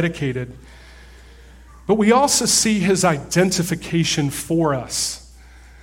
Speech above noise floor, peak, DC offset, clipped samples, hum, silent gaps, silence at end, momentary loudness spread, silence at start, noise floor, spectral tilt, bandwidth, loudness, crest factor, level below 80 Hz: 25 dB; -4 dBFS; under 0.1%; under 0.1%; none; none; 0.25 s; 11 LU; 0 s; -44 dBFS; -4 dB/octave; 16.5 kHz; -18 LUFS; 18 dB; -44 dBFS